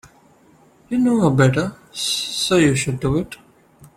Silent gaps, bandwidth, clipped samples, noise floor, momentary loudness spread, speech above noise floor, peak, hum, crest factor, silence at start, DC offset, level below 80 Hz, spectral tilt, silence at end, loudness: none; 15.5 kHz; under 0.1%; -52 dBFS; 11 LU; 34 dB; -2 dBFS; none; 18 dB; 0.9 s; under 0.1%; -46 dBFS; -5 dB/octave; 0.1 s; -19 LUFS